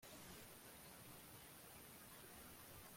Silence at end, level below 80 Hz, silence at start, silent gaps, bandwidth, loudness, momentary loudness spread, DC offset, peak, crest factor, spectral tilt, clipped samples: 0 s; -76 dBFS; 0 s; none; 16.5 kHz; -59 LUFS; 1 LU; under 0.1%; -46 dBFS; 14 dB; -3 dB/octave; under 0.1%